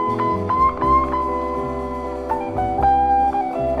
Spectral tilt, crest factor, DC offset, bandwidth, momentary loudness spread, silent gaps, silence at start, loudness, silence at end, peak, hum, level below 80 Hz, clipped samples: -8 dB/octave; 14 dB; under 0.1%; 10.5 kHz; 9 LU; none; 0 s; -20 LUFS; 0 s; -6 dBFS; none; -34 dBFS; under 0.1%